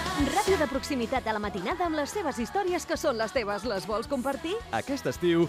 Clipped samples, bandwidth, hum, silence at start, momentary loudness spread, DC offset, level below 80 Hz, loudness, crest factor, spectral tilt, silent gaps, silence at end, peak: under 0.1%; 15.5 kHz; none; 0 s; 5 LU; under 0.1%; -48 dBFS; -29 LUFS; 16 dB; -4.5 dB/octave; none; 0 s; -14 dBFS